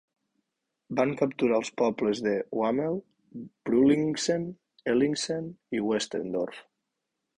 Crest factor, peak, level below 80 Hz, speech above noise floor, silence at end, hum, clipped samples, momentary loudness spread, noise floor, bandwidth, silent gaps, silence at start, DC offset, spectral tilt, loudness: 18 dB; -10 dBFS; -66 dBFS; 55 dB; 0.75 s; none; under 0.1%; 13 LU; -83 dBFS; 10.5 kHz; none; 0.9 s; under 0.1%; -5 dB/octave; -28 LUFS